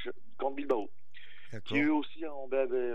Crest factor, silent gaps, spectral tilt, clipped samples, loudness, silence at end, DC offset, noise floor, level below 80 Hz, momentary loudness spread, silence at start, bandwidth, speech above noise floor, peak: 16 dB; none; -7 dB/octave; under 0.1%; -33 LUFS; 0 s; 2%; -58 dBFS; -80 dBFS; 19 LU; 0 s; 7.4 kHz; 26 dB; -16 dBFS